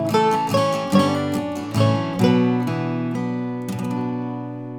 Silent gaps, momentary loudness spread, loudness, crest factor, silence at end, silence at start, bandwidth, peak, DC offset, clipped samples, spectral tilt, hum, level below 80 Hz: none; 8 LU; -21 LUFS; 18 dB; 0 s; 0 s; 19 kHz; -4 dBFS; under 0.1%; under 0.1%; -6.5 dB/octave; none; -60 dBFS